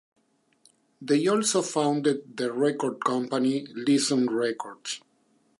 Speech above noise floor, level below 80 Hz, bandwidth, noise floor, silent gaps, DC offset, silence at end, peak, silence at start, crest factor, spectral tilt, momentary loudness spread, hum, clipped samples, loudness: 41 dB; -82 dBFS; 11.5 kHz; -67 dBFS; none; under 0.1%; 0.6 s; -10 dBFS; 1 s; 18 dB; -4 dB/octave; 12 LU; none; under 0.1%; -26 LUFS